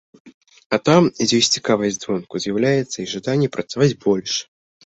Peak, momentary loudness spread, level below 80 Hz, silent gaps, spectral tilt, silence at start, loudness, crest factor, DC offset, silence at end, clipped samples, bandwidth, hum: -2 dBFS; 10 LU; -58 dBFS; 0.34-0.41 s, 0.66-0.70 s; -4.5 dB/octave; 0.25 s; -19 LUFS; 18 dB; under 0.1%; 0.4 s; under 0.1%; 8.2 kHz; none